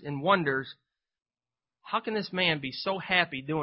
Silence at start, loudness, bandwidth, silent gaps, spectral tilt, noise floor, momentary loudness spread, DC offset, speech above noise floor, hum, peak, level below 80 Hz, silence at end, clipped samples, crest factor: 0 s; -28 LUFS; 5.8 kHz; none; -9 dB/octave; under -90 dBFS; 8 LU; under 0.1%; over 61 dB; none; -8 dBFS; -68 dBFS; 0 s; under 0.1%; 22 dB